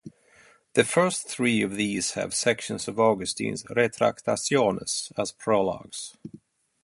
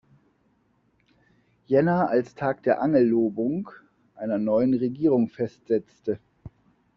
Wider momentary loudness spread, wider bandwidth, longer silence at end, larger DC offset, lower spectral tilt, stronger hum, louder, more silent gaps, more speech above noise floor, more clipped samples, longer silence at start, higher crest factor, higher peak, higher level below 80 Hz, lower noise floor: about the same, 9 LU vs 11 LU; first, 11.5 kHz vs 6.6 kHz; about the same, 0.45 s vs 0.5 s; neither; second, -3.5 dB/octave vs -8 dB/octave; neither; about the same, -25 LUFS vs -24 LUFS; neither; second, 32 dB vs 43 dB; neither; second, 0.05 s vs 1.7 s; about the same, 24 dB vs 20 dB; about the same, -4 dBFS vs -6 dBFS; about the same, -62 dBFS vs -64 dBFS; second, -58 dBFS vs -67 dBFS